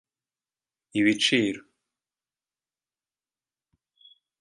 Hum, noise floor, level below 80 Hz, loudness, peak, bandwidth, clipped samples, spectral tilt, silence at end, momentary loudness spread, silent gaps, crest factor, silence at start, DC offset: none; under -90 dBFS; -72 dBFS; -24 LUFS; -8 dBFS; 11.5 kHz; under 0.1%; -3.5 dB/octave; 2.8 s; 12 LU; none; 24 dB; 0.95 s; under 0.1%